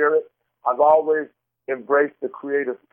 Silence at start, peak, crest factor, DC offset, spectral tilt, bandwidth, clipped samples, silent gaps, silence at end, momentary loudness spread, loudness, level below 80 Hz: 0 s; -4 dBFS; 16 dB; under 0.1%; -9.5 dB/octave; 3.4 kHz; under 0.1%; none; 0.15 s; 15 LU; -21 LUFS; -70 dBFS